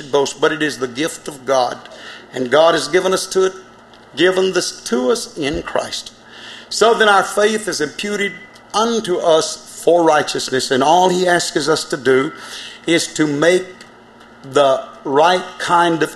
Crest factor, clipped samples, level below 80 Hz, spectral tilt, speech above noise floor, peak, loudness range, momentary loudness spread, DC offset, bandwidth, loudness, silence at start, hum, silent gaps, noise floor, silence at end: 16 dB; under 0.1%; -52 dBFS; -3.5 dB/octave; 27 dB; 0 dBFS; 3 LU; 13 LU; under 0.1%; 13 kHz; -16 LUFS; 0 s; none; none; -43 dBFS; 0 s